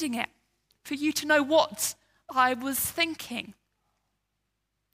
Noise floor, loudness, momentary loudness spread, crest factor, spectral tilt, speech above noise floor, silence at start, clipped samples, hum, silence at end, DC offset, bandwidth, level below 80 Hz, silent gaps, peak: -80 dBFS; -27 LUFS; 14 LU; 22 dB; -2 dB/octave; 53 dB; 0 s; under 0.1%; none; 1.4 s; under 0.1%; 16 kHz; -68 dBFS; none; -8 dBFS